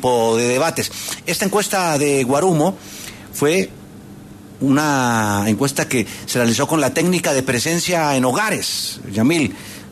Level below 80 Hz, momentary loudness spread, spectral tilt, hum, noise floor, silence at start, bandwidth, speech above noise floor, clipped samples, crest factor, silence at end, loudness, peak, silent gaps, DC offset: -52 dBFS; 7 LU; -4 dB/octave; none; -38 dBFS; 0 s; 13.5 kHz; 20 dB; under 0.1%; 14 dB; 0 s; -18 LUFS; -4 dBFS; none; under 0.1%